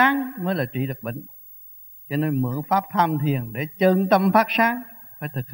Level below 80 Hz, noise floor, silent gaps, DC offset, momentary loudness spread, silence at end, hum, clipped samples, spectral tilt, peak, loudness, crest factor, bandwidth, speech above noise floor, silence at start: -64 dBFS; -44 dBFS; none; under 0.1%; 22 LU; 0 s; none; under 0.1%; -7.5 dB/octave; -4 dBFS; -22 LUFS; 20 dB; 16.5 kHz; 22 dB; 0 s